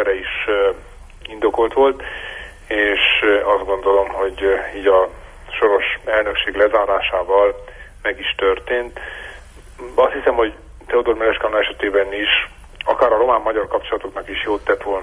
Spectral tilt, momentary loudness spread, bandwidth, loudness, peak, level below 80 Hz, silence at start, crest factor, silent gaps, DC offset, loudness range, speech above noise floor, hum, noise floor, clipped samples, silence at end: -4.5 dB/octave; 14 LU; 10.5 kHz; -18 LUFS; -2 dBFS; -40 dBFS; 0 s; 16 dB; none; under 0.1%; 3 LU; 21 dB; none; -39 dBFS; under 0.1%; 0 s